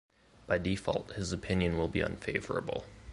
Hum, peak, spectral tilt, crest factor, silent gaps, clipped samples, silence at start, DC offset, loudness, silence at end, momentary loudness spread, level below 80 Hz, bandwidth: none; -14 dBFS; -6 dB/octave; 20 dB; none; under 0.1%; 0.4 s; under 0.1%; -34 LUFS; 0 s; 6 LU; -48 dBFS; 11.5 kHz